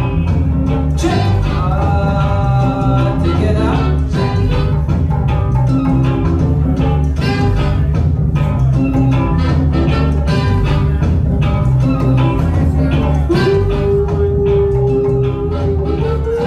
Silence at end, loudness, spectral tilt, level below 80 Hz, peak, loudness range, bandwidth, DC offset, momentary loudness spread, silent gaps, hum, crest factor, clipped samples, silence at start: 0 s; -14 LUFS; -8.5 dB/octave; -18 dBFS; -4 dBFS; 1 LU; 9.6 kHz; under 0.1%; 2 LU; none; none; 8 dB; under 0.1%; 0 s